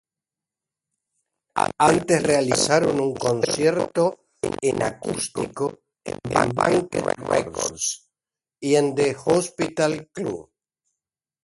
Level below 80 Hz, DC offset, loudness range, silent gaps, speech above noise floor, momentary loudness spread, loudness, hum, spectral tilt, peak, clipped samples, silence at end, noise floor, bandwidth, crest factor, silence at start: -54 dBFS; under 0.1%; 4 LU; none; over 68 dB; 11 LU; -22 LUFS; none; -4 dB/octave; -2 dBFS; under 0.1%; 1 s; under -90 dBFS; 11.5 kHz; 22 dB; 1.55 s